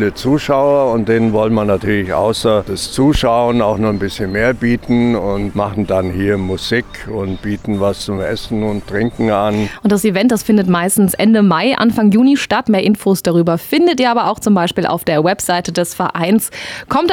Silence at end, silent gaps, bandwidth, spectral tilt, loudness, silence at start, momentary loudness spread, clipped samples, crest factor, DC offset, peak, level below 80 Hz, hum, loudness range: 0 s; none; 17.5 kHz; -5.5 dB/octave; -14 LUFS; 0 s; 7 LU; under 0.1%; 10 dB; under 0.1%; -2 dBFS; -36 dBFS; none; 6 LU